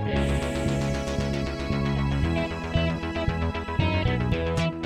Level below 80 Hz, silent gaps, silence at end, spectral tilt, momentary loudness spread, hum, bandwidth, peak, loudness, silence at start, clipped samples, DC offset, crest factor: -34 dBFS; none; 0 s; -6.5 dB/octave; 3 LU; none; 13 kHz; -10 dBFS; -27 LUFS; 0 s; under 0.1%; under 0.1%; 14 dB